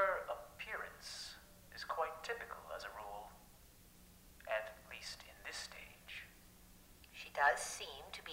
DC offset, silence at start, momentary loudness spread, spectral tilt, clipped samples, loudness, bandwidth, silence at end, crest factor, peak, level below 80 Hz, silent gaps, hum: under 0.1%; 0 s; 25 LU; -1 dB/octave; under 0.1%; -43 LUFS; 16 kHz; 0 s; 26 dB; -20 dBFS; -66 dBFS; none; none